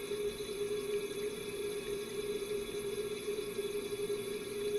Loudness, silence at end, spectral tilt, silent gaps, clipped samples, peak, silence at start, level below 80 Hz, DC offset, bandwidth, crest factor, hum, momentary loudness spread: -39 LUFS; 0 s; -3.5 dB/octave; none; under 0.1%; -26 dBFS; 0 s; -62 dBFS; under 0.1%; 15 kHz; 12 dB; none; 2 LU